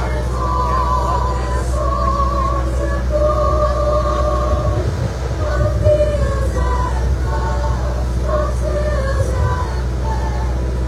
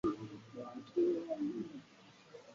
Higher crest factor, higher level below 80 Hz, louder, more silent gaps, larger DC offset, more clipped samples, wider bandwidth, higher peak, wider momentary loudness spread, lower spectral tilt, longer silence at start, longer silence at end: about the same, 14 dB vs 16 dB; first, -20 dBFS vs -72 dBFS; first, -18 LUFS vs -40 LUFS; neither; neither; neither; first, 11 kHz vs 7.4 kHz; first, -2 dBFS vs -24 dBFS; second, 5 LU vs 22 LU; about the same, -7 dB/octave vs -7 dB/octave; about the same, 0 s vs 0.05 s; about the same, 0 s vs 0 s